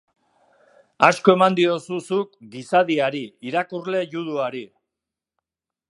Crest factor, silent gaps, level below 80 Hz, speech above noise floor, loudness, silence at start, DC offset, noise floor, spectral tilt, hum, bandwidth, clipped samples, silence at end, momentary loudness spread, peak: 22 dB; none; -74 dBFS; 67 dB; -21 LUFS; 1 s; under 0.1%; -88 dBFS; -5.5 dB/octave; none; 11.5 kHz; under 0.1%; 1.25 s; 13 LU; 0 dBFS